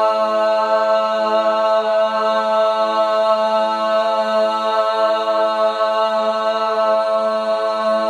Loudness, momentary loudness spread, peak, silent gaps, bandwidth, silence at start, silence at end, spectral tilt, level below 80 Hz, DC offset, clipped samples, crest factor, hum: -17 LUFS; 2 LU; -4 dBFS; none; 10 kHz; 0 s; 0 s; -3.5 dB/octave; under -90 dBFS; under 0.1%; under 0.1%; 14 dB; none